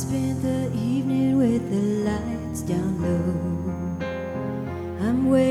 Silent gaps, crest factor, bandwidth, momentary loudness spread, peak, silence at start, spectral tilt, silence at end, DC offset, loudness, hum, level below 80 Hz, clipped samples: none; 14 dB; 13.5 kHz; 9 LU; -8 dBFS; 0 s; -7.5 dB/octave; 0 s; under 0.1%; -25 LUFS; none; -44 dBFS; under 0.1%